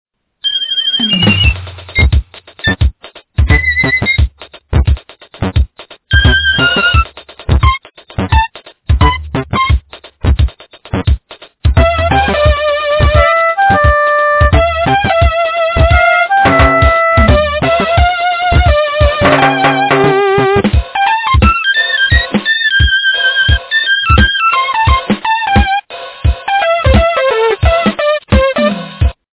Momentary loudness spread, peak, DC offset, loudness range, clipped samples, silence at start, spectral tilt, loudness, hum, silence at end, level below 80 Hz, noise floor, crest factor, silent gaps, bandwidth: 8 LU; 0 dBFS; under 0.1%; 4 LU; 0.1%; 0.45 s; -9 dB/octave; -11 LUFS; none; 0.25 s; -16 dBFS; -33 dBFS; 10 dB; none; 4 kHz